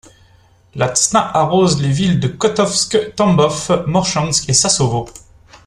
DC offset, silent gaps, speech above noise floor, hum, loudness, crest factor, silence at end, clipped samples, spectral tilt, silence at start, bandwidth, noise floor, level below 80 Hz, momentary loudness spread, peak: under 0.1%; none; 35 dB; none; -14 LUFS; 16 dB; 0.1 s; under 0.1%; -4 dB/octave; 0.75 s; 12.5 kHz; -50 dBFS; -44 dBFS; 5 LU; 0 dBFS